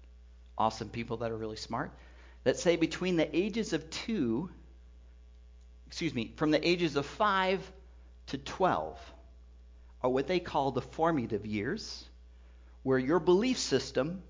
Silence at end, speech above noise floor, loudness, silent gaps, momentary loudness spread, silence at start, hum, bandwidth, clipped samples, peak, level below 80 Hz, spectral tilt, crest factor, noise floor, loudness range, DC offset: 0 s; 23 dB; -32 LUFS; none; 14 LU; 0 s; none; 7.6 kHz; under 0.1%; -14 dBFS; -54 dBFS; -5 dB/octave; 20 dB; -54 dBFS; 3 LU; under 0.1%